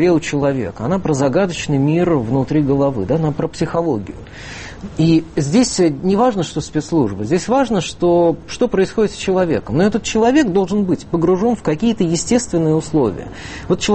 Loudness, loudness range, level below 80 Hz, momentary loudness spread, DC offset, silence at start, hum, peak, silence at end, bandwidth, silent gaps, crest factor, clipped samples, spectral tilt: -17 LUFS; 2 LU; -40 dBFS; 7 LU; under 0.1%; 0 s; none; -2 dBFS; 0 s; 8.8 kHz; none; 14 dB; under 0.1%; -6 dB/octave